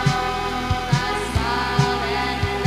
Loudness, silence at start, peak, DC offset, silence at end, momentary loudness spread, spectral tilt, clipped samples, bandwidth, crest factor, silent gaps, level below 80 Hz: -22 LUFS; 0 s; -4 dBFS; under 0.1%; 0 s; 3 LU; -5 dB/octave; under 0.1%; 15.5 kHz; 18 dB; none; -34 dBFS